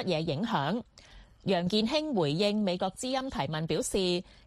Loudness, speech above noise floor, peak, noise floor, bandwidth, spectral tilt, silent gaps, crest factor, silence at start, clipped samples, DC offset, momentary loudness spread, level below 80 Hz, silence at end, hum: -30 LUFS; 24 dB; -14 dBFS; -54 dBFS; 13.5 kHz; -5 dB/octave; none; 16 dB; 0 s; under 0.1%; under 0.1%; 6 LU; -54 dBFS; 0.25 s; none